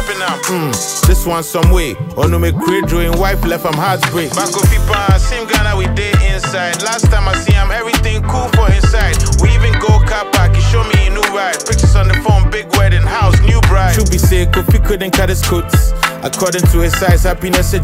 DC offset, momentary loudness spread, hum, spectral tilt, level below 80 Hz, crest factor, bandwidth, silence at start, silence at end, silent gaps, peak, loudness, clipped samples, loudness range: under 0.1%; 5 LU; none; -5 dB/octave; -14 dBFS; 10 dB; 16.5 kHz; 0 s; 0 s; none; 0 dBFS; -13 LUFS; under 0.1%; 2 LU